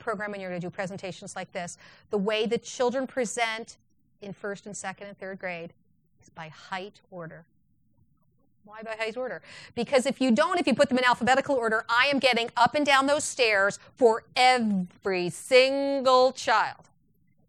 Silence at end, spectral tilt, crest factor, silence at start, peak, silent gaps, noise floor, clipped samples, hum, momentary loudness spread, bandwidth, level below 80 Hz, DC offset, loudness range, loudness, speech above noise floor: 0.75 s; -3.5 dB/octave; 22 dB; 0 s; -6 dBFS; none; -68 dBFS; under 0.1%; none; 19 LU; 13.5 kHz; -68 dBFS; under 0.1%; 16 LU; -25 LUFS; 42 dB